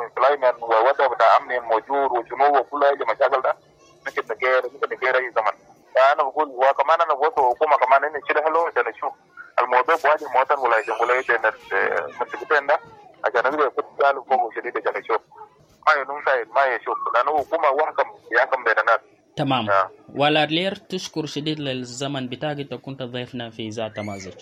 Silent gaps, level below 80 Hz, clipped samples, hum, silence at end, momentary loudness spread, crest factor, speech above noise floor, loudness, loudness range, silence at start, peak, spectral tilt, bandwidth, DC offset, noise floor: none; -68 dBFS; under 0.1%; none; 0 s; 11 LU; 18 dB; 25 dB; -21 LUFS; 4 LU; 0 s; -4 dBFS; -4.5 dB/octave; 11.5 kHz; under 0.1%; -46 dBFS